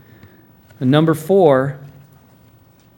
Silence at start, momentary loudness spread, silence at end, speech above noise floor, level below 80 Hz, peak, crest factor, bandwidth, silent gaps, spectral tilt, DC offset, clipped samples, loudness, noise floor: 0.8 s; 12 LU; 1.1 s; 36 dB; -60 dBFS; 0 dBFS; 18 dB; 17 kHz; none; -7.5 dB/octave; under 0.1%; under 0.1%; -15 LUFS; -50 dBFS